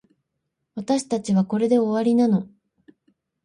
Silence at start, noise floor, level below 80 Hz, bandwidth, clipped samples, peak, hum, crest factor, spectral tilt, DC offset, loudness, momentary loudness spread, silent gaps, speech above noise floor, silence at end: 0.75 s; -78 dBFS; -68 dBFS; 11 kHz; under 0.1%; -8 dBFS; none; 14 dB; -7 dB/octave; under 0.1%; -21 LUFS; 16 LU; none; 58 dB; 1 s